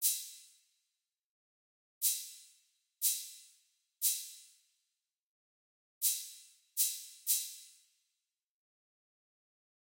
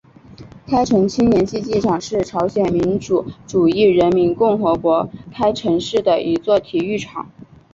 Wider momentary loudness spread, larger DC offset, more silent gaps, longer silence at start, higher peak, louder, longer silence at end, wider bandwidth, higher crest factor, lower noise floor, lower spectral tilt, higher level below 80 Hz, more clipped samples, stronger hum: first, 21 LU vs 8 LU; neither; first, 1.25-2.01 s, 5.22-6.01 s vs none; second, 0 s vs 0.4 s; second, -16 dBFS vs -2 dBFS; second, -34 LUFS vs -17 LUFS; first, 2.3 s vs 0.3 s; first, 16.5 kHz vs 7.8 kHz; first, 24 dB vs 14 dB; first, -88 dBFS vs -41 dBFS; second, 10.5 dB/octave vs -6.5 dB/octave; second, under -90 dBFS vs -46 dBFS; neither; neither